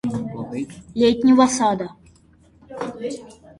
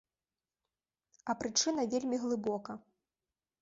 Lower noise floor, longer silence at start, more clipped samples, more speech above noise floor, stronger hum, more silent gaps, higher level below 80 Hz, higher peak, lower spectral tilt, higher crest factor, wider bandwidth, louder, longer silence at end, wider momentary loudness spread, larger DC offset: second, -53 dBFS vs under -90 dBFS; second, 0.05 s vs 1.25 s; neither; second, 35 dB vs over 56 dB; neither; neither; first, -54 dBFS vs -74 dBFS; first, -4 dBFS vs -16 dBFS; first, -5 dB/octave vs -3 dB/octave; about the same, 18 dB vs 20 dB; first, 11.5 kHz vs 7.6 kHz; first, -20 LUFS vs -34 LUFS; second, 0.25 s vs 0.8 s; first, 18 LU vs 15 LU; neither